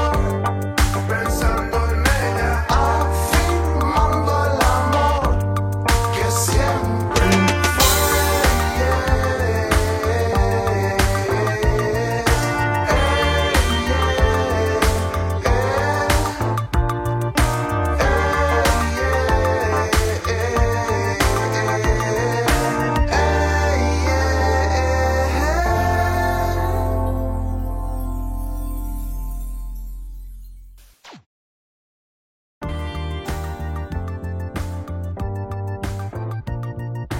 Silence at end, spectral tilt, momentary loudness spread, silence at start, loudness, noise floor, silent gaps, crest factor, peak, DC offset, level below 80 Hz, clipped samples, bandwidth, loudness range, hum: 0 s; -5 dB/octave; 11 LU; 0 s; -19 LUFS; -44 dBFS; 31.26-32.61 s; 18 dB; 0 dBFS; under 0.1%; -24 dBFS; under 0.1%; 16.5 kHz; 13 LU; none